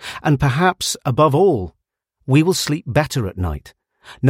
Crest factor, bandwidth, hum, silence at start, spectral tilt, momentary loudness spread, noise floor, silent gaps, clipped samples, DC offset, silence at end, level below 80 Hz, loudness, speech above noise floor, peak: 18 dB; 16.5 kHz; none; 0 s; -5.5 dB/octave; 11 LU; -69 dBFS; none; under 0.1%; under 0.1%; 0 s; -38 dBFS; -18 LUFS; 52 dB; 0 dBFS